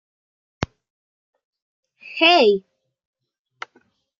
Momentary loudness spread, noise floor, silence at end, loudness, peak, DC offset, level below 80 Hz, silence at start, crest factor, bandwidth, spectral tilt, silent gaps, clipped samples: 26 LU; -61 dBFS; 1.6 s; -16 LUFS; -2 dBFS; under 0.1%; -54 dBFS; 0.6 s; 22 dB; 7.4 kHz; -4.5 dB/octave; 0.90-1.33 s, 1.45-1.53 s, 1.62-1.83 s; under 0.1%